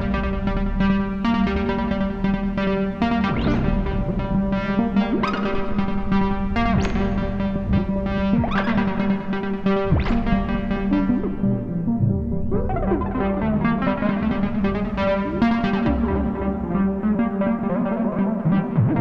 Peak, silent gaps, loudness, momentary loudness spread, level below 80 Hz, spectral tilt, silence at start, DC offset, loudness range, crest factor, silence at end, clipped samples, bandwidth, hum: -6 dBFS; none; -22 LUFS; 4 LU; -30 dBFS; -9 dB/octave; 0 s; under 0.1%; 1 LU; 14 dB; 0 s; under 0.1%; 7 kHz; none